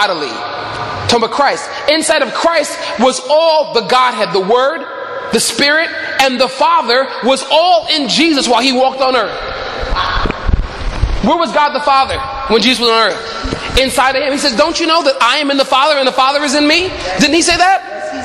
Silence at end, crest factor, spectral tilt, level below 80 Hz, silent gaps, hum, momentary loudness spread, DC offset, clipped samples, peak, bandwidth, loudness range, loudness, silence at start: 0 s; 12 dB; -3 dB/octave; -28 dBFS; none; none; 9 LU; under 0.1%; under 0.1%; 0 dBFS; 15.5 kHz; 3 LU; -12 LUFS; 0 s